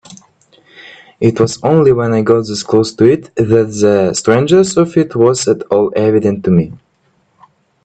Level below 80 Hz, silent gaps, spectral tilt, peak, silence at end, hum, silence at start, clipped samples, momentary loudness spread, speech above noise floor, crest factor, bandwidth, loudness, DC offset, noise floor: -48 dBFS; none; -6 dB/octave; 0 dBFS; 1.1 s; none; 0.1 s; under 0.1%; 4 LU; 46 dB; 12 dB; 9.2 kHz; -12 LUFS; under 0.1%; -57 dBFS